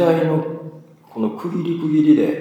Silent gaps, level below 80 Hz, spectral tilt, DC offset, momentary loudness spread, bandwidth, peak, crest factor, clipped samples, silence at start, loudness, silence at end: none; -76 dBFS; -9 dB/octave; under 0.1%; 19 LU; 7.6 kHz; -2 dBFS; 16 dB; under 0.1%; 0 s; -19 LUFS; 0 s